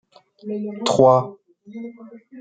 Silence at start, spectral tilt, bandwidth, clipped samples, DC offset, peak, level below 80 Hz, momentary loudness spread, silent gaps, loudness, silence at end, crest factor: 0.45 s; -6 dB/octave; 9.4 kHz; under 0.1%; under 0.1%; -2 dBFS; -64 dBFS; 23 LU; none; -18 LUFS; 0 s; 20 dB